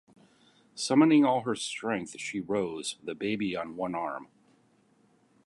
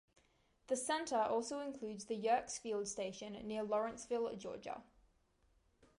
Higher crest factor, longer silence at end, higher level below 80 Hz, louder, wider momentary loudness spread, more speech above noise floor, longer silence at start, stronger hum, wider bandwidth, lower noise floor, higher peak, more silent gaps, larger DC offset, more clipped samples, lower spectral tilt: about the same, 22 dB vs 18 dB; about the same, 1.2 s vs 1.15 s; about the same, -72 dBFS vs -74 dBFS; first, -29 LUFS vs -41 LUFS; first, 14 LU vs 11 LU; about the same, 37 dB vs 35 dB; about the same, 0.75 s vs 0.7 s; neither; about the same, 11.5 kHz vs 11.5 kHz; second, -66 dBFS vs -75 dBFS; first, -10 dBFS vs -22 dBFS; neither; neither; neither; first, -4.5 dB/octave vs -3 dB/octave